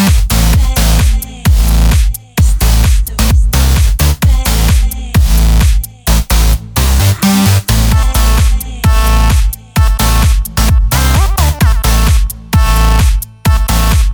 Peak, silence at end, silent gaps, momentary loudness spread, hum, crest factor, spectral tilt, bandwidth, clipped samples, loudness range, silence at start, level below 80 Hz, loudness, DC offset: 0 dBFS; 0 s; none; 4 LU; none; 8 dB; -4.5 dB/octave; over 20 kHz; under 0.1%; 1 LU; 0 s; -10 dBFS; -11 LUFS; under 0.1%